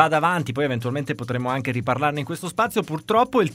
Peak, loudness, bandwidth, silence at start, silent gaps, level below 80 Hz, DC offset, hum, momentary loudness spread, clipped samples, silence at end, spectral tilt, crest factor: -2 dBFS; -23 LUFS; 16 kHz; 0 s; none; -58 dBFS; under 0.1%; none; 8 LU; under 0.1%; 0 s; -6 dB/octave; 22 dB